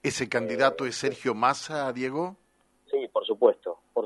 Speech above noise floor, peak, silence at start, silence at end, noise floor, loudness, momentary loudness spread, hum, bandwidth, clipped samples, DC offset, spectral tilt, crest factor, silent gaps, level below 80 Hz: 38 dB; -6 dBFS; 0.05 s; 0 s; -65 dBFS; -27 LUFS; 9 LU; none; 11.5 kHz; under 0.1%; under 0.1%; -4 dB/octave; 20 dB; none; -70 dBFS